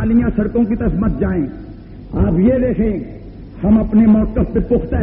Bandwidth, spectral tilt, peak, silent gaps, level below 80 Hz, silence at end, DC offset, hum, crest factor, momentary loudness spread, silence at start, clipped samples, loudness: 3.3 kHz; -10.5 dB/octave; -4 dBFS; none; -26 dBFS; 0 s; 0.1%; none; 10 dB; 21 LU; 0 s; under 0.1%; -16 LUFS